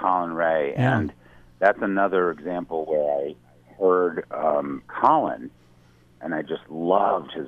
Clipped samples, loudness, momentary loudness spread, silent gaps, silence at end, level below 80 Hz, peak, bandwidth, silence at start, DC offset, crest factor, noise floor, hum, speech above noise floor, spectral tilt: under 0.1%; -23 LUFS; 11 LU; none; 0 s; -58 dBFS; -4 dBFS; 7.4 kHz; 0 s; under 0.1%; 20 dB; -55 dBFS; none; 32 dB; -8.5 dB/octave